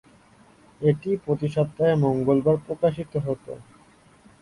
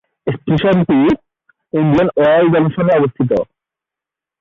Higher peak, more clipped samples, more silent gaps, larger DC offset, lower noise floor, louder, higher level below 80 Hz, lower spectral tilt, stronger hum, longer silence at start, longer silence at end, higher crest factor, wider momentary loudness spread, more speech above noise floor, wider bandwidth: second, -8 dBFS vs -2 dBFS; neither; neither; neither; second, -55 dBFS vs -86 dBFS; second, -24 LUFS vs -14 LUFS; second, -56 dBFS vs -46 dBFS; about the same, -9 dB/octave vs -9.5 dB/octave; neither; first, 0.8 s vs 0.25 s; second, 0.8 s vs 0.95 s; first, 18 dB vs 12 dB; about the same, 10 LU vs 11 LU; second, 32 dB vs 74 dB; first, 11.5 kHz vs 6.8 kHz